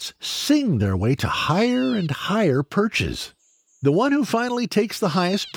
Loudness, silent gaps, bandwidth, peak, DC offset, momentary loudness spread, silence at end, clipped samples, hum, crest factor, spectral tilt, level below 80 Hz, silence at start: -21 LUFS; none; over 20 kHz; -6 dBFS; under 0.1%; 5 LU; 0.05 s; under 0.1%; none; 14 dB; -5.5 dB/octave; -48 dBFS; 0 s